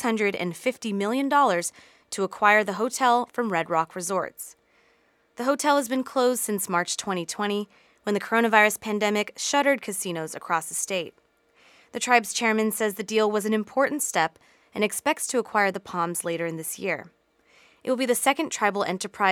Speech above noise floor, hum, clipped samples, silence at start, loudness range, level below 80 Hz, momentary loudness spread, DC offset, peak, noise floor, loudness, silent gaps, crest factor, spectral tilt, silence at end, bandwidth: 40 dB; none; under 0.1%; 0 s; 3 LU; -74 dBFS; 10 LU; under 0.1%; -2 dBFS; -64 dBFS; -25 LUFS; none; 24 dB; -3 dB/octave; 0 s; 18.5 kHz